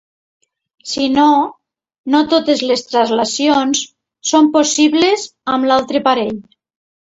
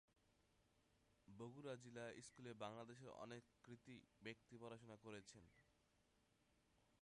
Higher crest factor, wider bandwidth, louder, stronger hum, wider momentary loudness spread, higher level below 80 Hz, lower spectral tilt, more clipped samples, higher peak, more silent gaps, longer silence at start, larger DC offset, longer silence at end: second, 16 dB vs 22 dB; second, 8 kHz vs 11 kHz; first, -14 LUFS vs -59 LUFS; neither; about the same, 12 LU vs 10 LU; first, -56 dBFS vs -86 dBFS; second, -2.5 dB/octave vs -5 dB/octave; neither; first, 0 dBFS vs -38 dBFS; first, 1.98-2.04 s vs none; first, 0.85 s vs 0.15 s; neither; first, 0.8 s vs 0.05 s